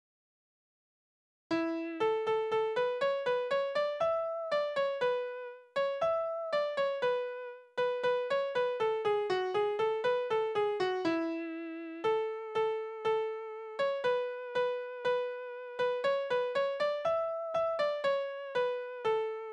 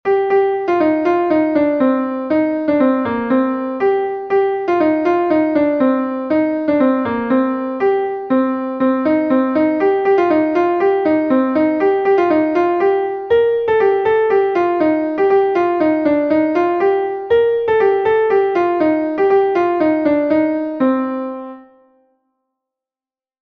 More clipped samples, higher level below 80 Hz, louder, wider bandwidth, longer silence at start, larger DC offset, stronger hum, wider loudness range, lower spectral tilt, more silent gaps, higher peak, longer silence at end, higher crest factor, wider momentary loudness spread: neither; second, -76 dBFS vs -54 dBFS; second, -33 LUFS vs -15 LUFS; first, 9.8 kHz vs 6.2 kHz; first, 1.5 s vs 0.05 s; neither; neither; about the same, 2 LU vs 2 LU; second, -4.5 dB/octave vs -8 dB/octave; neither; second, -20 dBFS vs -4 dBFS; second, 0 s vs 1.8 s; about the same, 14 dB vs 12 dB; about the same, 5 LU vs 4 LU